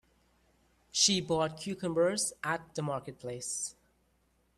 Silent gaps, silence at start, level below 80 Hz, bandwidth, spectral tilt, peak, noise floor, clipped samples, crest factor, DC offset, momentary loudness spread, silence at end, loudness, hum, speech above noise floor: none; 0.95 s; -66 dBFS; 13.5 kHz; -2.5 dB/octave; -12 dBFS; -72 dBFS; under 0.1%; 22 dB; under 0.1%; 13 LU; 0.85 s; -32 LUFS; none; 39 dB